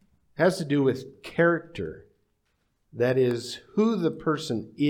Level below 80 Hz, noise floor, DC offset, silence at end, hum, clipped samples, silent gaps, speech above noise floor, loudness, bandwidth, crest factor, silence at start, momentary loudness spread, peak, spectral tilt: -64 dBFS; -73 dBFS; under 0.1%; 0 s; none; under 0.1%; none; 47 dB; -26 LUFS; 16 kHz; 18 dB; 0.4 s; 13 LU; -8 dBFS; -6.5 dB/octave